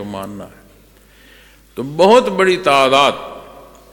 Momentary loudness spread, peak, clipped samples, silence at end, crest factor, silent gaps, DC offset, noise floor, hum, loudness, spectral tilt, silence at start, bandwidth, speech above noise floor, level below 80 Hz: 23 LU; 0 dBFS; under 0.1%; 0.45 s; 16 dB; none; under 0.1%; -47 dBFS; none; -12 LUFS; -4 dB/octave; 0 s; 17.5 kHz; 33 dB; -50 dBFS